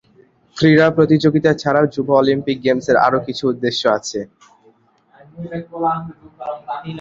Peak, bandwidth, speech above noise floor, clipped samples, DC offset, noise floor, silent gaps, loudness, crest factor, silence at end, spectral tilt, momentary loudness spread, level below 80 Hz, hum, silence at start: 0 dBFS; 7.6 kHz; 38 dB; under 0.1%; under 0.1%; -54 dBFS; none; -16 LUFS; 18 dB; 0 s; -6 dB/octave; 16 LU; -54 dBFS; none; 0.55 s